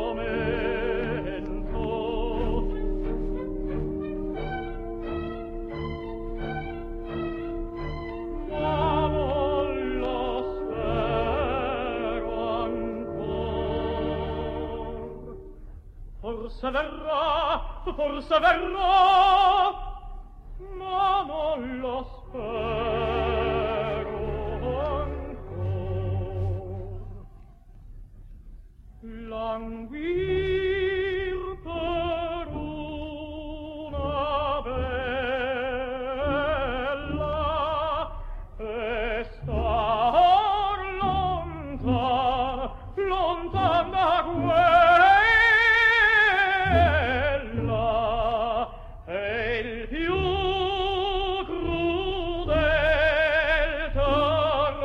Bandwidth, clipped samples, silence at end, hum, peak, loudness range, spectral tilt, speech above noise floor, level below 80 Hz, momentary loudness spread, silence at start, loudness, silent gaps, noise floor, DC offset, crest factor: 8.2 kHz; under 0.1%; 0 s; none; -8 dBFS; 13 LU; -7 dB/octave; 26 dB; -36 dBFS; 15 LU; 0 s; -25 LUFS; none; -48 dBFS; under 0.1%; 18 dB